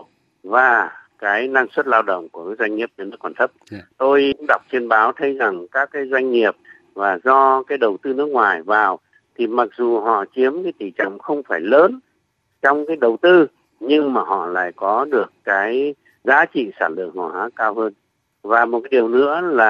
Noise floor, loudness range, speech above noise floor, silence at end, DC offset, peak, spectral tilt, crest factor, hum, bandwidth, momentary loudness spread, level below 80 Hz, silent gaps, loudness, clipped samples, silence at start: -68 dBFS; 3 LU; 50 dB; 0 s; under 0.1%; 0 dBFS; -6 dB/octave; 18 dB; none; 6.8 kHz; 12 LU; -68 dBFS; none; -18 LUFS; under 0.1%; 0.45 s